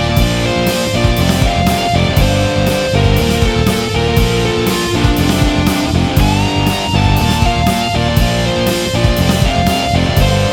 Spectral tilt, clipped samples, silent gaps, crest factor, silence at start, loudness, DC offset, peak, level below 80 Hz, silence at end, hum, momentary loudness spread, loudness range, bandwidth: -5 dB/octave; under 0.1%; none; 12 dB; 0 s; -13 LUFS; 0.1%; 0 dBFS; -20 dBFS; 0 s; none; 2 LU; 0 LU; 19 kHz